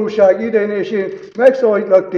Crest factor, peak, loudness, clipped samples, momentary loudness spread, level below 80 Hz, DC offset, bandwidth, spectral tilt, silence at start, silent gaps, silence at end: 14 dB; 0 dBFS; -14 LUFS; 0.2%; 8 LU; -60 dBFS; under 0.1%; 6.8 kHz; -7 dB/octave; 0 s; none; 0 s